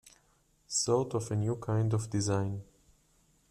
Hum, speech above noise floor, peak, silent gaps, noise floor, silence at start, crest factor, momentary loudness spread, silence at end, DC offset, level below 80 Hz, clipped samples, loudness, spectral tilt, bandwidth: none; 38 dB; -16 dBFS; none; -69 dBFS; 0.05 s; 18 dB; 5 LU; 0.85 s; under 0.1%; -62 dBFS; under 0.1%; -32 LUFS; -5.5 dB/octave; 12.5 kHz